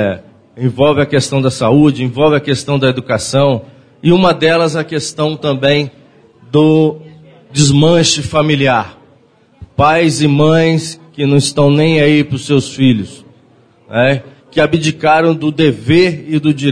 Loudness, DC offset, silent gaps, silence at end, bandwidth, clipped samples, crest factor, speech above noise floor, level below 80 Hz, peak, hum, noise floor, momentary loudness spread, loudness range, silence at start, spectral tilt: -12 LUFS; under 0.1%; none; 0 s; 10.5 kHz; under 0.1%; 12 dB; 37 dB; -44 dBFS; 0 dBFS; none; -48 dBFS; 9 LU; 2 LU; 0 s; -5.5 dB/octave